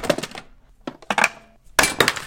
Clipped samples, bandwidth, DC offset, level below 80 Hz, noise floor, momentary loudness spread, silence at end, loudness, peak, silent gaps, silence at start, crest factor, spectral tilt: under 0.1%; 17 kHz; under 0.1%; -48 dBFS; -45 dBFS; 21 LU; 0 s; -20 LUFS; 0 dBFS; none; 0 s; 24 dB; -2 dB/octave